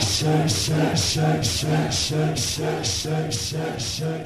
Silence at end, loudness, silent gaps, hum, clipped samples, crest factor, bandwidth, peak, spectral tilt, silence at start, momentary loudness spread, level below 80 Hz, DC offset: 0 s; -22 LUFS; none; none; under 0.1%; 14 dB; 14 kHz; -8 dBFS; -4 dB/octave; 0 s; 6 LU; -42 dBFS; under 0.1%